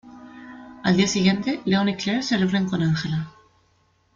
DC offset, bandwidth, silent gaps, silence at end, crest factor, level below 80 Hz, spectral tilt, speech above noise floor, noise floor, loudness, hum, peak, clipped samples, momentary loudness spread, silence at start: under 0.1%; 7.6 kHz; none; 0.85 s; 18 dB; -56 dBFS; -5.5 dB/octave; 42 dB; -63 dBFS; -22 LUFS; none; -6 dBFS; under 0.1%; 22 LU; 0.05 s